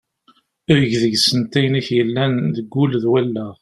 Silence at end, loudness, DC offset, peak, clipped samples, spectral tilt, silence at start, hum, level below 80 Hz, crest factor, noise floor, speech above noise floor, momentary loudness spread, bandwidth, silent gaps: 0.05 s; -17 LUFS; under 0.1%; -2 dBFS; under 0.1%; -5.5 dB/octave; 0.7 s; none; -52 dBFS; 16 dB; -57 dBFS; 40 dB; 6 LU; 13.5 kHz; none